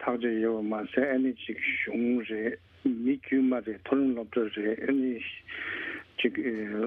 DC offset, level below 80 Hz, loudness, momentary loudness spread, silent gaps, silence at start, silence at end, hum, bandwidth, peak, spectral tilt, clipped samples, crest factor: under 0.1%; -68 dBFS; -30 LUFS; 8 LU; none; 0 s; 0 s; none; 3.8 kHz; -12 dBFS; -8 dB/octave; under 0.1%; 18 dB